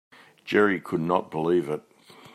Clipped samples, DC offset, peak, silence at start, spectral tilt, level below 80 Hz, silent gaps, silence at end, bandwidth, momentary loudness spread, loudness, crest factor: under 0.1%; under 0.1%; -6 dBFS; 0.45 s; -7 dB/octave; -70 dBFS; none; 0.55 s; 13 kHz; 12 LU; -25 LUFS; 20 dB